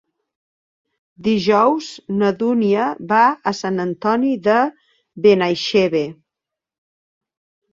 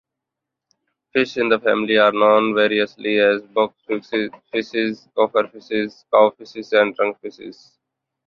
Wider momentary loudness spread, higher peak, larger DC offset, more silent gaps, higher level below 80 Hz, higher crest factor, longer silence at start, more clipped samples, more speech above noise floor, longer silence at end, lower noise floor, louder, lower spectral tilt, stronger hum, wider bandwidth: about the same, 8 LU vs 10 LU; about the same, -2 dBFS vs -2 dBFS; neither; neither; about the same, -62 dBFS vs -64 dBFS; about the same, 18 dB vs 18 dB; about the same, 1.2 s vs 1.15 s; neither; about the same, 68 dB vs 65 dB; first, 1.6 s vs 0.75 s; about the same, -85 dBFS vs -83 dBFS; about the same, -17 LUFS vs -19 LUFS; about the same, -6 dB/octave vs -5.5 dB/octave; neither; first, 7.6 kHz vs 6.8 kHz